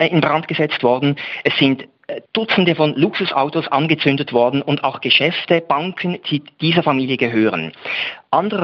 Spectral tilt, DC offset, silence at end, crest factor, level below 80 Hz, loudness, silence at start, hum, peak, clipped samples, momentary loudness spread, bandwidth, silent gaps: -7.5 dB/octave; under 0.1%; 0 s; 16 dB; -62 dBFS; -17 LUFS; 0 s; none; -2 dBFS; under 0.1%; 8 LU; 6.2 kHz; none